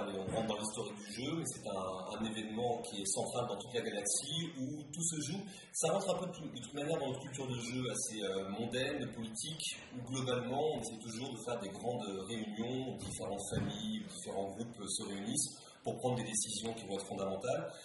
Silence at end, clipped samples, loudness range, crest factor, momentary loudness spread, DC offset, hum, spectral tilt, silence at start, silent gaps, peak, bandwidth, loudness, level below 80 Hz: 0 s; under 0.1%; 3 LU; 18 dB; 7 LU; under 0.1%; none; -3.5 dB/octave; 0 s; none; -20 dBFS; 11.5 kHz; -39 LUFS; -68 dBFS